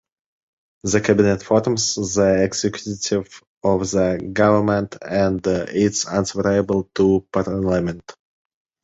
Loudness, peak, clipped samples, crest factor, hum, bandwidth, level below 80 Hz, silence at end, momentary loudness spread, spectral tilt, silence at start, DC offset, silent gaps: -20 LUFS; -2 dBFS; under 0.1%; 18 dB; none; 8 kHz; -44 dBFS; 0.7 s; 8 LU; -5 dB/octave; 0.85 s; under 0.1%; 3.47-3.61 s